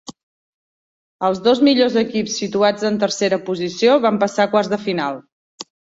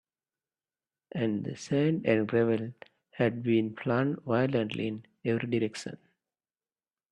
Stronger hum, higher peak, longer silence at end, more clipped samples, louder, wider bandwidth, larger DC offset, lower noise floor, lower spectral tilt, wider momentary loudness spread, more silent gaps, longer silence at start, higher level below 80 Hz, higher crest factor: neither; first, -2 dBFS vs -12 dBFS; second, 0.35 s vs 1.15 s; neither; first, -18 LUFS vs -30 LUFS; second, 8 kHz vs 10.5 kHz; neither; about the same, under -90 dBFS vs under -90 dBFS; second, -4.5 dB/octave vs -7 dB/octave; about the same, 11 LU vs 9 LU; first, 0.23-1.19 s, 5.32-5.58 s vs none; second, 0.1 s vs 1.15 s; first, -62 dBFS vs -70 dBFS; about the same, 16 dB vs 20 dB